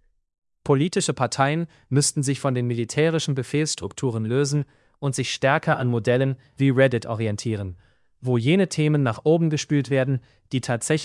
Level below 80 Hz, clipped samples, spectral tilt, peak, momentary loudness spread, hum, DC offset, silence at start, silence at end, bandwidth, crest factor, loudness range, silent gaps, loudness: -62 dBFS; under 0.1%; -5.5 dB/octave; -4 dBFS; 8 LU; none; under 0.1%; 0.65 s; 0 s; 12 kHz; 18 dB; 1 LU; none; -23 LUFS